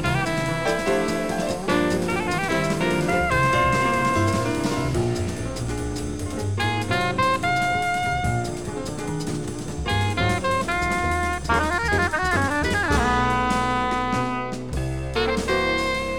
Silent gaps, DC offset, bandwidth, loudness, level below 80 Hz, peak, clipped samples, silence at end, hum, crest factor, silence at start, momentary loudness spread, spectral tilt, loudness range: none; under 0.1%; 19.5 kHz; -23 LUFS; -36 dBFS; -8 dBFS; under 0.1%; 0 s; none; 16 dB; 0 s; 8 LU; -5 dB/octave; 3 LU